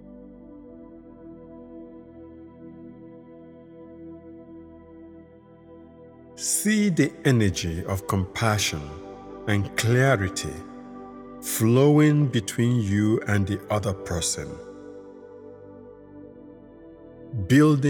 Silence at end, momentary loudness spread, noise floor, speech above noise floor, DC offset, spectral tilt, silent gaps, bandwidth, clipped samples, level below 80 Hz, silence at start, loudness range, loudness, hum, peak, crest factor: 0 s; 25 LU; -49 dBFS; 27 dB; under 0.1%; -5.5 dB/octave; none; 19.5 kHz; under 0.1%; -52 dBFS; 0.05 s; 22 LU; -23 LUFS; none; -6 dBFS; 20 dB